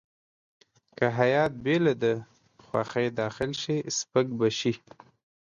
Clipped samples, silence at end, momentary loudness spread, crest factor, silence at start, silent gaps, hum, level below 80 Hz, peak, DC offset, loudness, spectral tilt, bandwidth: under 0.1%; 0.65 s; 8 LU; 20 dB; 1 s; none; none; -62 dBFS; -8 dBFS; under 0.1%; -27 LUFS; -5 dB/octave; 10 kHz